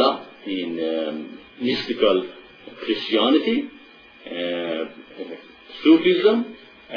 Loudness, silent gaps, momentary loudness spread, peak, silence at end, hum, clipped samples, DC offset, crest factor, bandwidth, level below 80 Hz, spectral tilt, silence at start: -21 LUFS; none; 20 LU; -4 dBFS; 0 s; none; under 0.1%; under 0.1%; 18 dB; 5.4 kHz; -62 dBFS; -6.5 dB/octave; 0 s